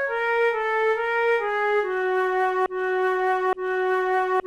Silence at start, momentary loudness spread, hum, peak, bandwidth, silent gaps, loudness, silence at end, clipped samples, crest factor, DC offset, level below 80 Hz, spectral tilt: 0 s; 2 LU; none; -12 dBFS; 12 kHz; none; -23 LUFS; 0 s; under 0.1%; 10 dB; under 0.1%; -60 dBFS; -3.5 dB/octave